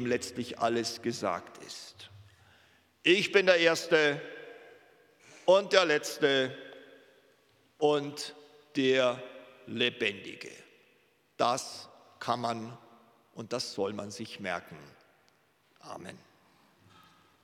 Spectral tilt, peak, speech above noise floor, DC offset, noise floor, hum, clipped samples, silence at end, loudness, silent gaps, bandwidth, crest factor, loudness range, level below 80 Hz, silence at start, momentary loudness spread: -3.5 dB/octave; -6 dBFS; 38 dB; under 0.1%; -68 dBFS; none; under 0.1%; 1.25 s; -29 LUFS; none; 16 kHz; 28 dB; 12 LU; -82 dBFS; 0 s; 23 LU